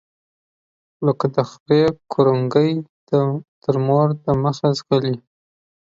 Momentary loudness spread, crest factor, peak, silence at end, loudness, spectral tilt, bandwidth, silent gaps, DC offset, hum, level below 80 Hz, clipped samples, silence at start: 7 LU; 18 dB; -2 dBFS; 0.75 s; -19 LUFS; -8 dB/octave; 7.6 kHz; 1.60-1.66 s, 2.89-3.07 s, 3.48-3.61 s; under 0.1%; none; -54 dBFS; under 0.1%; 1 s